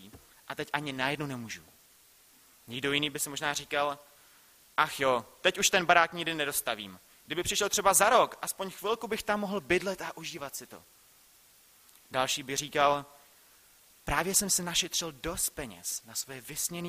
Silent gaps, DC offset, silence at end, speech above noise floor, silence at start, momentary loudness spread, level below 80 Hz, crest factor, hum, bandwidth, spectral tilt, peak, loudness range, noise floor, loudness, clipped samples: none; under 0.1%; 0 s; 30 dB; 0 s; 15 LU; -58 dBFS; 26 dB; none; 15.5 kHz; -2 dB/octave; -6 dBFS; 7 LU; -61 dBFS; -29 LUFS; under 0.1%